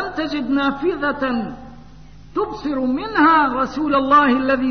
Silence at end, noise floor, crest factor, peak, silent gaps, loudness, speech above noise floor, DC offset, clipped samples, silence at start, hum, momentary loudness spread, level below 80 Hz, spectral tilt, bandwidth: 0 s; -42 dBFS; 16 dB; -4 dBFS; none; -18 LUFS; 25 dB; 0.6%; under 0.1%; 0 s; none; 11 LU; -46 dBFS; -6 dB/octave; 6.6 kHz